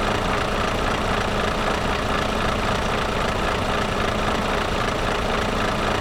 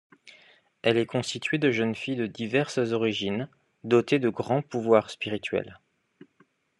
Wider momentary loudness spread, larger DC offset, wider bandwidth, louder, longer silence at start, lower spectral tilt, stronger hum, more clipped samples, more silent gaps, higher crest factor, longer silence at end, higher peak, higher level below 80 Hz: second, 1 LU vs 9 LU; neither; first, 19 kHz vs 11 kHz; first, -22 LUFS vs -27 LUFS; second, 0 s vs 0.25 s; about the same, -4.5 dB/octave vs -5.5 dB/octave; neither; neither; neither; second, 12 dB vs 22 dB; second, 0 s vs 1.05 s; second, -10 dBFS vs -6 dBFS; first, -30 dBFS vs -72 dBFS